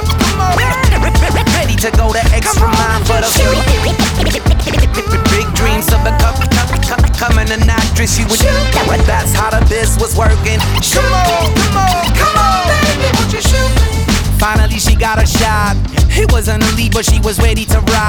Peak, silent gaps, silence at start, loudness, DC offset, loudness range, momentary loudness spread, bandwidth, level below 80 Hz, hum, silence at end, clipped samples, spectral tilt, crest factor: 0 dBFS; none; 0 s; -12 LUFS; under 0.1%; 1 LU; 2 LU; over 20 kHz; -14 dBFS; none; 0 s; under 0.1%; -4.5 dB/octave; 10 dB